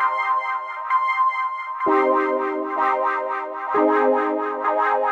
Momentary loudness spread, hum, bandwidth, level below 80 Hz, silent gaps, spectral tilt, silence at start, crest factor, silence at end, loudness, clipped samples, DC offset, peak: 7 LU; none; 7.8 kHz; -74 dBFS; none; -5 dB/octave; 0 s; 16 dB; 0 s; -21 LUFS; under 0.1%; under 0.1%; -6 dBFS